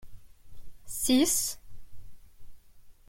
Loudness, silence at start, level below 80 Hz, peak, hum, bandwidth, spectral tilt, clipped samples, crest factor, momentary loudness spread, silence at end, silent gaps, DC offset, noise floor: -27 LUFS; 0 s; -52 dBFS; -12 dBFS; none; 16.5 kHz; -2 dB/octave; under 0.1%; 20 dB; 17 LU; 0.15 s; none; under 0.1%; -51 dBFS